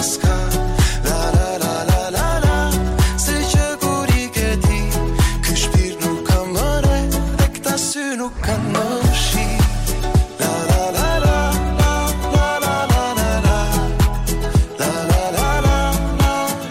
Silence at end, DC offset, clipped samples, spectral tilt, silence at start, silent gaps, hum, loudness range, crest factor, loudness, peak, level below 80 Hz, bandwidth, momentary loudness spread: 0 s; under 0.1%; under 0.1%; -4.5 dB/octave; 0 s; none; none; 1 LU; 12 dB; -18 LUFS; -6 dBFS; -20 dBFS; 16.5 kHz; 3 LU